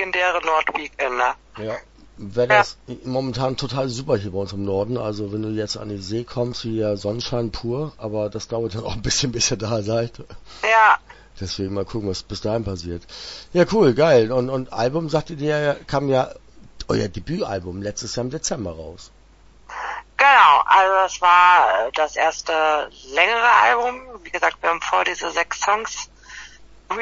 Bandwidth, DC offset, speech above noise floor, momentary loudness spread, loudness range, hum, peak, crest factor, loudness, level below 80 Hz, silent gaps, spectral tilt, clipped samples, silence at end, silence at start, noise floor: 8 kHz; under 0.1%; 29 dB; 16 LU; 10 LU; none; 0 dBFS; 20 dB; -20 LUFS; -46 dBFS; none; -4 dB/octave; under 0.1%; 0 s; 0 s; -49 dBFS